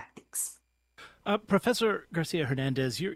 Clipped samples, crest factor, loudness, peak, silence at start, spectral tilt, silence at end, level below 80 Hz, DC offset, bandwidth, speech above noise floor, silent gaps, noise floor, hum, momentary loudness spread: under 0.1%; 20 dB; -30 LUFS; -10 dBFS; 0 s; -4.5 dB/octave; 0 s; -62 dBFS; under 0.1%; 16 kHz; 29 dB; none; -58 dBFS; none; 9 LU